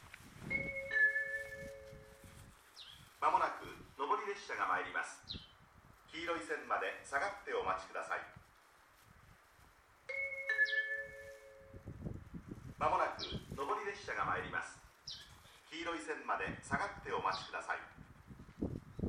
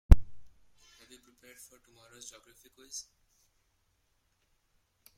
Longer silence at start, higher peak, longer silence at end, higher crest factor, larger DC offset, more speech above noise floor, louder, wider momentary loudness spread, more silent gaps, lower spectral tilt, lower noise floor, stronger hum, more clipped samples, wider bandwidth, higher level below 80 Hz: about the same, 0 s vs 0.1 s; second, -20 dBFS vs -2 dBFS; second, 0 s vs 4.75 s; second, 22 dB vs 28 dB; neither; about the same, 25 dB vs 23 dB; second, -39 LUFS vs -31 LUFS; second, 22 LU vs 29 LU; neither; second, -4 dB/octave vs -6 dB/octave; second, -66 dBFS vs -75 dBFS; neither; neither; first, 16 kHz vs 13 kHz; second, -64 dBFS vs -32 dBFS